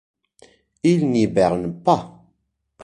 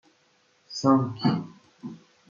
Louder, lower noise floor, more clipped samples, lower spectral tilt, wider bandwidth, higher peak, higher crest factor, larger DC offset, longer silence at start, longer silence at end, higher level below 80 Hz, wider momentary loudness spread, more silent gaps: first, -19 LUFS vs -25 LUFS; first, -70 dBFS vs -65 dBFS; neither; about the same, -7 dB/octave vs -6.5 dB/octave; first, 10 kHz vs 7.4 kHz; first, -2 dBFS vs -6 dBFS; about the same, 20 dB vs 22 dB; neither; first, 0.85 s vs 0.7 s; second, 0 s vs 0.35 s; first, -52 dBFS vs -70 dBFS; second, 5 LU vs 21 LU; neither